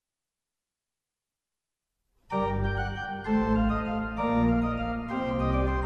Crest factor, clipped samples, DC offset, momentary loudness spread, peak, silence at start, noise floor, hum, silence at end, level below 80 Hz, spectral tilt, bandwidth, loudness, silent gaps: 14 dB; under 0.1%; under 0.1%; 7 LU; -14 dBFS; 2.3 s; -89 dBFS; none; 0 s; -38 dBFS; -8.5 dB/octave; 6.6 kHz; -28 LUFS; none